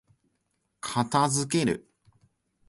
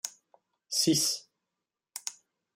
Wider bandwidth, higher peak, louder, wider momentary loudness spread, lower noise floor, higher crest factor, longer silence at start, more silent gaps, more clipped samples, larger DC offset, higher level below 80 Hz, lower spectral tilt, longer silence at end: second, 11.5 kHz vs 16 kHz; first, -10 dBFS vs -14 dBFS; about the same, -27 LUFS vs -29 LUFS; second, 11 LU vs 16 LU; second, -76 dBFS vs -88 dBFS; about the same, 20 dB vs 22 dB; first, 0.85 s vs 0.05 s; neither; neither; neither; first, -62 dBFS vs -76 dBFS; first, -4.5 dB/octave vs -2.5 dB/octave; first, 0.9 s vs 0.45 s